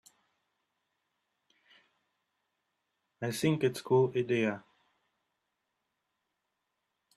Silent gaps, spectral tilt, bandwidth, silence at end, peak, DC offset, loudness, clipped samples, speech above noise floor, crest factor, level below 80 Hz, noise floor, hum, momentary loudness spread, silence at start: none; -6 dB/octave; 13 kHz; 2.6 s; -16 dBFS; under 0.1%; -31 LUFS; under 0.1%; 54 dB; 20 dB; -78 dBFS; -84 dBFS; none; 11 LU; 3.2 s